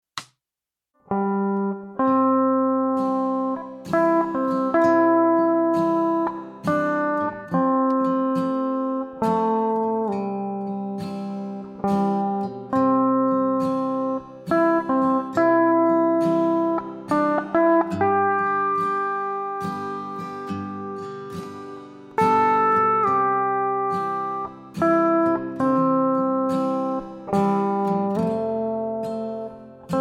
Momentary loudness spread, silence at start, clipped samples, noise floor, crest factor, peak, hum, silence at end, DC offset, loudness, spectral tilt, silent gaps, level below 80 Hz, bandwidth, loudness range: 12 LU; 0.15 s; under 0.1%; -88 dBFS; 14 dB; -8 dBFS; none; 0 s; under 0.1%; -22 LUFS; -8 dB/octave; none; -64 dBFS; 11 kHz; 5 LU